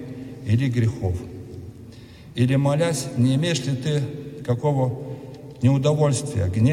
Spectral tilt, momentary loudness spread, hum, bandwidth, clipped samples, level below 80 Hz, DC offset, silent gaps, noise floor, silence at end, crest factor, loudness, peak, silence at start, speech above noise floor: -6.5 dB/octave; 18 LU; none; 15 kHz; under 0.1%; -52 dBFS; under 0.1%; none; -42 dBFS; 0 s; 16 dB; -22 LUFS; -6 dBFS; 0 s; 22 dB